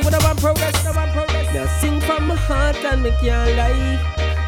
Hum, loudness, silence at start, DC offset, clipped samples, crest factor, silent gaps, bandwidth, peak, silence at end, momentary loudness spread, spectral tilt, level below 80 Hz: none; -19 LUFS; 0 s; under 0.1%; under 0.1%; 14 dB; none; 19 kHz; -4 dBFS; 0 s; 4 LU; -5 dB/octave; -20 dBFS